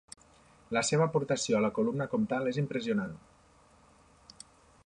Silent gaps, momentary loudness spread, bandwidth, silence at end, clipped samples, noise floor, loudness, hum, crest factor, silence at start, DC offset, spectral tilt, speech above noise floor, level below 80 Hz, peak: none; 24 LU; 11 kHz; 1.7 s; under 0.1%; -62 dBFS; -31 LUFS; none; 18 dB; 0.7 s; under 0.1%; -5 dB/octave; 32 dB; -66 dBFS; -16 dBFS